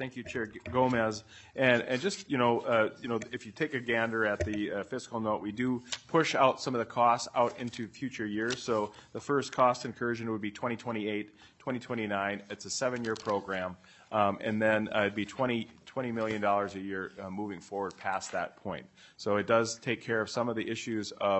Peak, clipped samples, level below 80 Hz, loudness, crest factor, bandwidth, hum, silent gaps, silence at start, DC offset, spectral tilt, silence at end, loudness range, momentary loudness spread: -10 dBFS; under 0.1%; -66 dBFS; -32 LUFS; 20 dB; 8.6 kHz; none; none; 0 s; under 0.1%; -4.5 dB/octave; 0 s; 5 LU; 12 LU